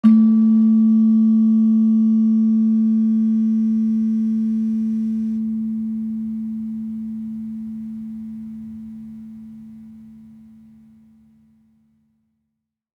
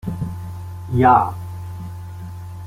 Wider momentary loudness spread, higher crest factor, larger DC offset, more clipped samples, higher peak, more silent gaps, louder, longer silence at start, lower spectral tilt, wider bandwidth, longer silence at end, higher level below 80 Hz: about the same, 20 LU vs 20 LU; about the same, 16 dB vs 20 dB; neither; neither; about the same, -4 dBFS vs -2 dBFS; neither; about the same, -18 LUFS vs -18 LUFS; about the same, 0.05 s vs 0.05 s; first, -10.5 dB/octave vs -8.5 dB/octave; second, 1.7 kHz vs 16 kHz; first, 2.8 s vs 0 s; second, -62 dBFS vs -46 dBFS